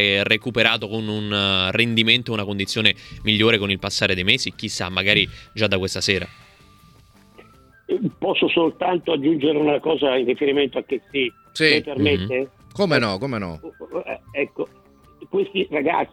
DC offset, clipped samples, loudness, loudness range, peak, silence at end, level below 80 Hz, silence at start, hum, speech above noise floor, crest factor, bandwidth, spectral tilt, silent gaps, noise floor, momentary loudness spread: under 0.1%; under 0.1%; -20 LUFS; 6 LU; 0 dBFS; 0.05 s; -52 dBFS; 0 s; none; 30 dB; 22 dB; 15 kHz; -4.5 dB/octave; none; -51 dBFS; 10 LU